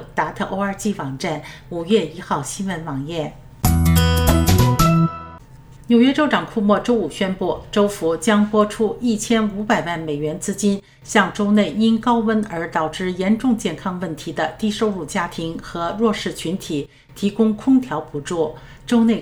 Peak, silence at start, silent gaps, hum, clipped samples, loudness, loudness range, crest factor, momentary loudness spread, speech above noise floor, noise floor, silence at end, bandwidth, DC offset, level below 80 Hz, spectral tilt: -2 dBFS; 0 s; none; none; under 0.1%; -20 LUFS; 6 LU; 18 dB; 11 LU; 23 dB; -42 dBFS; 0 s; 16.5 kHz; under 0.1%; -34 dBFS; -5.5 dB/octave